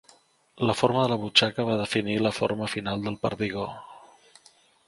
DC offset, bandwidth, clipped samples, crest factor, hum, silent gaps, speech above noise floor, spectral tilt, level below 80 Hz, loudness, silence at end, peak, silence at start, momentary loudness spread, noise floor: under 0.1%; 11.5 kHz; under 0.1%; 24 dB; none; none; 34 dB; -5 dB/octave; -58 dBFS; -26 LUFS; 0.9 s; -2 dBFS; 0.55 s; 9 LU; -59 dBFS